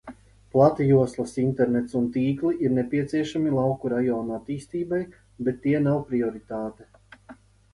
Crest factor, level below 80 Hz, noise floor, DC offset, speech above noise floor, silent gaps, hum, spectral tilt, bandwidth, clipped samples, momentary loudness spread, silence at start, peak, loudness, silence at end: 18 dB; -56 dBFS; -50 dBFS; under 0.1%; 26 dB; none; none; -8.5 dB/octave; 11.5 kHz; under 0.1%; 11 LU; 0.05 s; -6 dBFS; -25 LUFS; 0.4 s